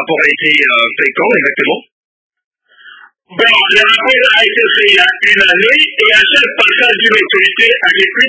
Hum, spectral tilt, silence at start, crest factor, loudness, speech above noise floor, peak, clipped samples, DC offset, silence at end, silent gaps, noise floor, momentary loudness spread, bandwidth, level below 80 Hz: none; -2.5 dB/octave; 0 s; 10 dB; -7 LUFS; 29 dB; 0 dBFS; 0.8%; under 0.1%; 0 s; 1.92-2.30 s, 2.44-2.51 s; -39 dBFS; 5 LU; 8 kHz; -52 dBFS